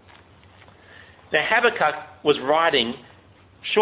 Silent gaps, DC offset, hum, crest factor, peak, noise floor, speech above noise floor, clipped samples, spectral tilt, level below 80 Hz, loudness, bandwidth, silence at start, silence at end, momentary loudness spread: none; under 0.1%; none; 20 dB; -4 dBFS; -52 dBFS; 31 dB; under 0.1%; -7 dB/octave; -60 dBFS; -21 LUFS; 4 kHz; 1.3 s; 0 s; 9 LU